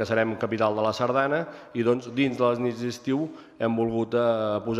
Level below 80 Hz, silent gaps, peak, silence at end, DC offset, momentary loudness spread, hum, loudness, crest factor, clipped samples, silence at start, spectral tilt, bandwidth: -62 dBFS; none; -8 dBFS; 0 s; under 0.1%; 6 LU; none; -26 LUFS; 16 dB; under 0.1%; 0 s; -6.5 dB/octave; 13 kHz